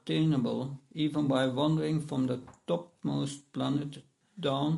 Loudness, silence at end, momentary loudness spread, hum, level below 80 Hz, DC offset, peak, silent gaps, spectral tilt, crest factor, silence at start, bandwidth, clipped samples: -32 LUFS; 0 s; 9 LU; none; -66 dBFS; under 0.1%; -16 dBFS; none; -7 dB/octave; 16 dB; 0.05 s; 11.5 kHz; under 0.1%